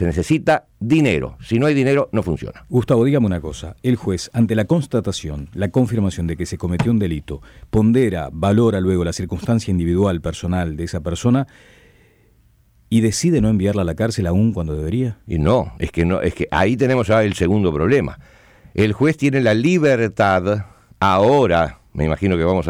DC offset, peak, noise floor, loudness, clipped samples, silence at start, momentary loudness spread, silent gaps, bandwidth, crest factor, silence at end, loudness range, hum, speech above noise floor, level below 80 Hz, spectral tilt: under 0.1%; -6 dBFS; -54 dBFS; -18 LUFS; under 0.1%; 0 s; 9 LU; none; 15.5 kHz; 12 dB; 0 s; 4 LU; none; 37 dB; -36 dBFS; -7 dB/octave